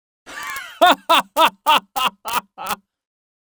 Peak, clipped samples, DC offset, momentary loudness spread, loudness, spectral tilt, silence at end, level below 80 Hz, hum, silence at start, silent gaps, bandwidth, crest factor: 0 dBFS; under 0.1%; under 0.1%; 15 LU; -17 LUFS; -1 dB/octave; 0.8 s; -60 dBFS; none; 0.3 s; none; over 20 kHz; 20 dB